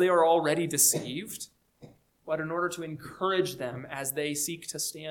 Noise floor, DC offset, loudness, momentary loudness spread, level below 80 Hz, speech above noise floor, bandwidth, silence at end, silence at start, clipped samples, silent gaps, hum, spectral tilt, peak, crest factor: -55 dBFS; under 0.1%; -28 LUFS; 15 LU; -70 dBFS; 26 dB; 19 kHz; 0 s; 0 s; under 0.1%; none; none; -3 dB/octave; -10 dBFS; 18 dB